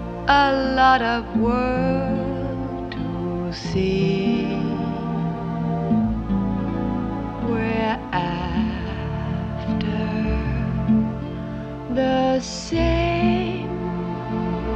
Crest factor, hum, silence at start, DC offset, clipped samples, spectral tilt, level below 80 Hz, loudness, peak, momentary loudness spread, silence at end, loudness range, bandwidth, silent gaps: 20 dB; none; 0 s; under 0.1%; under 0.1%; -7 dB/octave; -34 dBFS; -23 LUFS; -2 dBFS; 8 LU; 0 s; 3 LU; 8.2 kHz; none